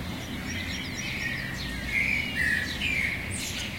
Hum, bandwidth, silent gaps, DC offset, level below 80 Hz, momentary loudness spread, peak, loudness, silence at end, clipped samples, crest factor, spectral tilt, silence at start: none; 16.5 kHz; none; 0.1%; -44 dBFS; 7 LU; -16 dBFS; -28 LUFS; 0 s; under 0.1%; 16 dB; -3 dB/octave; 0 s